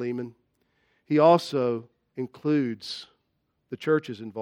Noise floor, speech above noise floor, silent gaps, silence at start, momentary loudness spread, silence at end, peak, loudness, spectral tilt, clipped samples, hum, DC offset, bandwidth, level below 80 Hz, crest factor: -75 dBFS; 50 dB; none; 0 s; 19 LU; 0 s; -6 dBFS; -26 LUFS; -7 dB/octave; under 0.1%; none; under 0.1%; 14 kHz; -78 dBFS; 22 dB